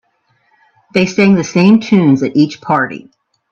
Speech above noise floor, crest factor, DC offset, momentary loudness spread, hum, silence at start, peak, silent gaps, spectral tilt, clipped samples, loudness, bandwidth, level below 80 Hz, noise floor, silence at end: 48 dB; 12 dB; under 0.1%; 8 LU; none; 0.95 s; 0 dBFS; none; -6.5 dB/octave; under 0.1%; -12 LUFS; 7.4 kHz; -54 dBFS; -59 dBFS; 0.55 s